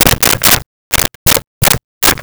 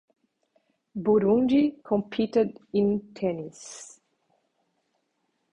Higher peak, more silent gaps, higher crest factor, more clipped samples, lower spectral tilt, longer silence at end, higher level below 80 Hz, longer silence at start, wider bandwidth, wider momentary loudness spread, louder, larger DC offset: first, 0 dBFS vs -10 dBFS; first, 0.66-0.91 s, 1.15-1.26 s, 1.47-1.61 s, 1.84-2.01 s vs none; about the same, 12 dB vs 16 dB; neither; second, -2 dB/octave vs -7 dB/octave; second, 0 s vs 1.65 s; first, -28 dBFS vs -62 dBFS; second, 0 s vs 0.95 s; first, over 20 kHz vs 10.5 kHz; second, 5 LU vs 20 LU; first, -10 LUFS vs -25 LUFS; first, 0.9% vs under 0.1%